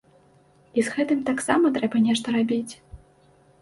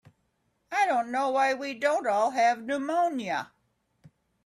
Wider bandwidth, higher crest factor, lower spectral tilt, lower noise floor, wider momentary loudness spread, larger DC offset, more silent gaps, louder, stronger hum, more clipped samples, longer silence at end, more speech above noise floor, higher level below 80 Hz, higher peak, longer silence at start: second, 11.5 kHz vs 13 kHz; about the same, 20 dB vs 16 dB; about the same, -4.5 dB/octave vs -3.5 dB/octave; second, -57 dBFS vs -74 dBFS; about the same, 8 LU vs 8 LU; neither; neither; first, -23 LUFS vs -27 LUFS; neither; neither; second, 0.65 s vs 1 s; second, 35 dB vs 47 dB; first, -56 dBFS vs -78 dBFS; first, -4 dBFS vs -12 dBFS; about the same, 0.75 s vs 0.7 s